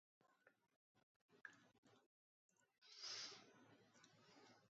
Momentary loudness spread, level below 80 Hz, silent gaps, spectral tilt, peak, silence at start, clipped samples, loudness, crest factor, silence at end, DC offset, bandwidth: 14 LU; under -90 dBFS; 0.76-0.95 s, 1.03-1.29 s, 1.78-1.83 s, 2.06-2.49 s, 2.78-2.82 s; 0.5 dB/octave; -42 dBFS; 0.2 s; under 0.1%; -56 LUFS; 22 dB; 0 s; under 0.1%; 7.6 kHz